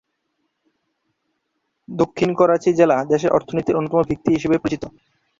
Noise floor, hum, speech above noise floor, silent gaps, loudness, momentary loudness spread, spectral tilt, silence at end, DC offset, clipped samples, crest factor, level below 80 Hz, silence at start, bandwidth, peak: -73 dBFS; none; 56 dB; none; -19 LUFS; 9 LU; -7 dB/octave; 0.5 s; under 0.1%; under 0.1%; 18 dB; -52 dBFS; 1.9 s; 7.6 kHz; -2 dBFS